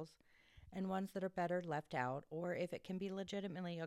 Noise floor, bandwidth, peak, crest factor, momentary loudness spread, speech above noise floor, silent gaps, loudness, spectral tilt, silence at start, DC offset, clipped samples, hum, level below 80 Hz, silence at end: -70 dBFS; 13.5 kHz; -26 dBFS; 18 dB; 5 LU; 27 dB; none; -44 LUFS; -6.5 dB/octave; 0 s; under 0.1%; under 0.1%; none; -76 dBFS; 0 s